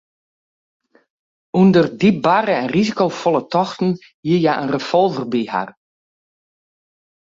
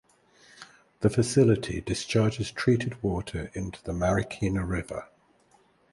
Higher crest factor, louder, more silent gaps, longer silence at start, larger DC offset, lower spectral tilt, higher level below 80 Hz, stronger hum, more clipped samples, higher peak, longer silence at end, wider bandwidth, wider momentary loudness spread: about the same, 16 dB vs 20 dB; first, -17 LUFS vs -27 LUFS; first, 4.14-4.23 s vs none; first, 1.55 s vs 0.6 s; neither; about the same, -7 dB/octave vs -6 dB/octave; second, -58 dBFS vs -46 dBFS; neither; neither; first, -2 dBFS vs -8 dBFS; first, 1.7 s vs 0.9 s; second, 7.6 kHz vs 11.5 kHz; second, 9 LU vs 13 LU